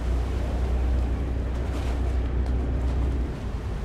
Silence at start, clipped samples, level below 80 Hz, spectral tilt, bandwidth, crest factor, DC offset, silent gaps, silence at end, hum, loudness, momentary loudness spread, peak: 0 s; under 0.1%; -26 dBFS; -7.5 dB/octave; 8.4 kHz; 10 dB; under 0.1%; none; 0 s; none; -28 LUFS; 3 LU; -16 dBFS